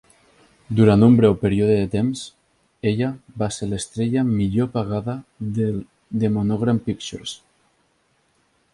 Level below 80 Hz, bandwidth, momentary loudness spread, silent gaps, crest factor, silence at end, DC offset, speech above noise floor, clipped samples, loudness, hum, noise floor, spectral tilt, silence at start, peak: -46 dBFS; 11.5 kHz; 16 LU; none; 18 dB; 1.35 s; under 0.1%; 45 dB; under 0.1%; -21 LUFS; none; -65 dBFS; -7 dB/octave; 0.7 s; -2 dBFS